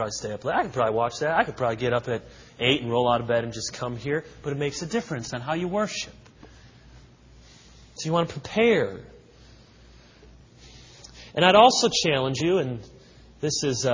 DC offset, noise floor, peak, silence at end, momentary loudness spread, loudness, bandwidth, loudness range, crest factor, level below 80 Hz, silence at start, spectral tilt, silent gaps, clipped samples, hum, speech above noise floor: under 0.1%; -52 dBFS; 0 dBFS; 0 s; 12 LU; -24 LUFS; 7.6 kHz; 9 LU; 24 dB; -54 dBFS; 0 s; -4 dB/octave; none; under 0.1%; none; 27 dB